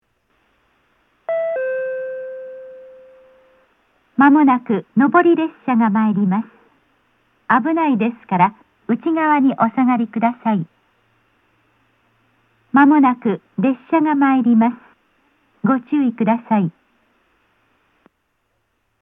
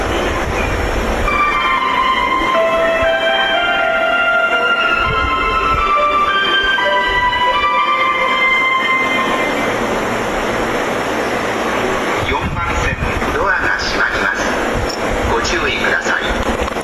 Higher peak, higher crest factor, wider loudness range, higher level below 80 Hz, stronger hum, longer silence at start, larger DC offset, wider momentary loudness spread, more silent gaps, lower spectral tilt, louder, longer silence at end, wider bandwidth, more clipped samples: about the same, -2 dBFS vs -2 dBFS; first, 18 dB vs 12 dB; first, 7 LU vs 4 LU; second, -74 dBFS vs -28 dBFS; neither; first, 1.3 s vs 0 s; neither; first, 14 LU vs 5 LU; neither; first, -10 dB/octave vs -4 dB/octave; about the same, -17 LUFS vs -15 LUFS; first, 2.3 s vs 0 s; second, 3.8 kHz vs 14 kHz; neither